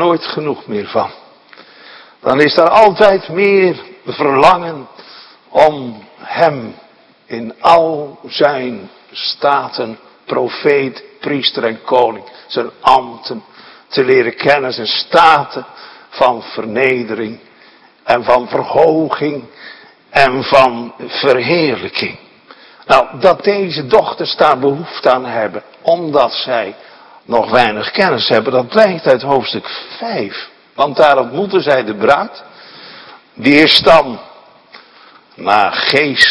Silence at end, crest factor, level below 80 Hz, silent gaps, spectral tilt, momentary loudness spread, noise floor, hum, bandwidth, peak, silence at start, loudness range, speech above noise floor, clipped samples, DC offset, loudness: 0 s; 14 dB; -50 dBFS; none; -5 dB/octave; 16 LU; -45 dBFS; none; 11 kHz; 0 dBFS; 0 s; 4 LU; 32 dB; 0.6%; under 0.1%; -13 LUFS